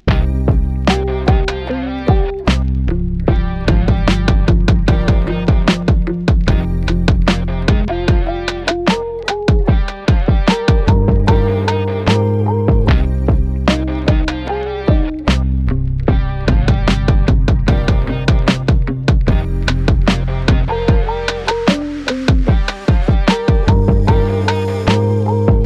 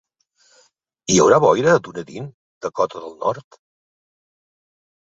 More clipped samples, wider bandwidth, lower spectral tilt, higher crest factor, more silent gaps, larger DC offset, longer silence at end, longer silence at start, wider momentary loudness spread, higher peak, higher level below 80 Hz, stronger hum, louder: neither; first, 9.2 kHz vs 8 kHz; first, -7 dB/octave vs -4.5 dB/octave; second, 12 dB vs 20 dB; second, none vs 2.34-2.61 s; neither; second, 0 s vs 1.6 s; second, 0.05 s vs 1.1 s; second, 4 LU vs 20 LU; about the same, -2 dBFS vs -2 dBFS; first, -16 dBFS vs -58 dBFS; neither; about the same, -15 LUFS vs -17 LUFS